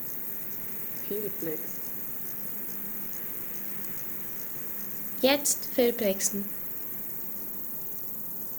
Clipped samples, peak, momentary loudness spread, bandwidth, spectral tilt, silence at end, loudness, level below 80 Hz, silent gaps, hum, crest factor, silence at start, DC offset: under 0.1%; -10 dBFS; 7 LU; over 20 kHz; -2.5 dB/octave; 0 s; -29 LUFS; -66 dBFS; none; none; 22 dB; 0 s; under 0.1%